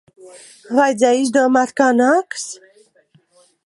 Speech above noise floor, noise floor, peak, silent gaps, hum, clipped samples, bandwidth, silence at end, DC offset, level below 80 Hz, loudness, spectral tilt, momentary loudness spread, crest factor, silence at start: 40 dB; -56 dBFS; -2 dBFS; none; none; under 0.1%; 11.5 kHz; 1.1 s; under 0.1%; -72 dBFS; -16 LUFS; -3 dB/octave; 13 LU; 16 dB; 0.25 s